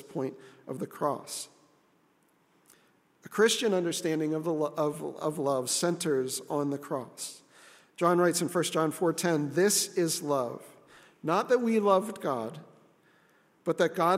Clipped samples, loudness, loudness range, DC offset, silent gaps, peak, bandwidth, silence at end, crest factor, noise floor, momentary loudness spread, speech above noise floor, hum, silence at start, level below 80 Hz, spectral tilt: under 0.1%; -29 LUFS; 4 LU; under 0.1%; none; -10 dBFS; 16 kHz; 0 s; 20 dB; -68 dBFS; 14 LU; 39 dB; none; 0.1 s; -82 dBFS; -4 dB/octave